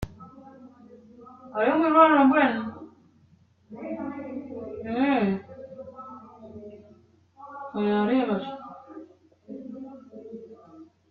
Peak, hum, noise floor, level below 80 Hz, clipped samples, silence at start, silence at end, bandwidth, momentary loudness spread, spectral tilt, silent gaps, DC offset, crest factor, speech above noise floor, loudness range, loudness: -6 dBFS; none; -60 dBFS; -58 dBFS; under 0.1%; 0 s; 0.25 s; 4.9 kHz; 27 LU; -4.5 dB/octave; none; under 0.1%; 22 dB; 39 dB; 8 LU; -24 LUFS